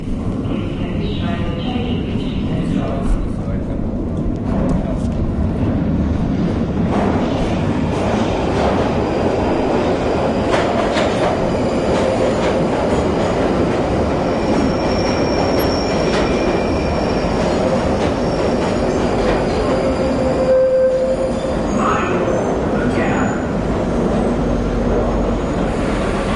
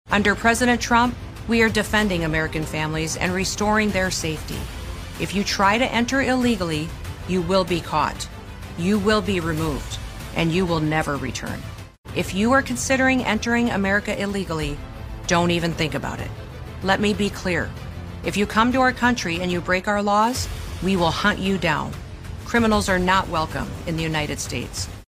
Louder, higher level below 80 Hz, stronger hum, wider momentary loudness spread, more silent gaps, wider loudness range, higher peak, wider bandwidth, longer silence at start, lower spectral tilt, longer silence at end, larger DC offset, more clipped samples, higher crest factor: first, -18 LUFS vs -22 LUFS; first, -28 dBFS vs -38 dBFS; neither; second, 5 LU vs 14 LU; second, none vs 11.98-12.04 s; about the same, 4 LU vs 3 LU; about the same, -2 dBFS vs -2 dBFS; second, 12 kHz vs 15.5 kHz; about the same, 0 s vs 0.05 s; first, -7 dB/octave vs -4.5 dB/octave; about the same, 0 s vs 0.05 s; neither; neither; second, 14 dB vs 20 dB